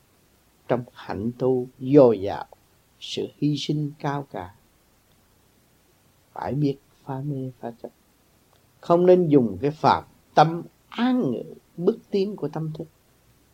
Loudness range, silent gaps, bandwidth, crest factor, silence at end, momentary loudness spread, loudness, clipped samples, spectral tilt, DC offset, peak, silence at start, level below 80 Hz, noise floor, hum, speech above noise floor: 11 LU; none; 16 kHz; 22 dB; 0.7 s; 20 LU; -23 LUFS; under 0.1%; -7.5 dB/octave; under 0.1%; -2 dBFS; 0.7 s; -64 dBFS; -61 dBFS; none; 38 dB